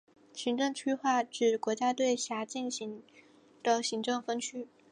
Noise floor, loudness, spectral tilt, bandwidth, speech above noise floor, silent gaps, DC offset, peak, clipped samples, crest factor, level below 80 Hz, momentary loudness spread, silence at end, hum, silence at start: -60 dBFS; -32 LUFS; -2.5 dB/octave; 11 kHz; 28 dB; none; under 0.1%; -14 dBFS; under 0.1%; 18 dB; -86 dBFS; 10 LU; 0.25 s; none; 0.35 s